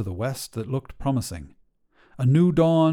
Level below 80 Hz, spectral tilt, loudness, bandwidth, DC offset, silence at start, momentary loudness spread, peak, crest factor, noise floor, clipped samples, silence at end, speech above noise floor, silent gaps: -46 dBFS; -7.5 dB/octave; -23 LUFS; 16.5 kHz; under 0.1%; 0 s; 13 LU; -8 dBFS; 16 dB; -61 dBFS; under 0.1%; 0 s; 39 dB; none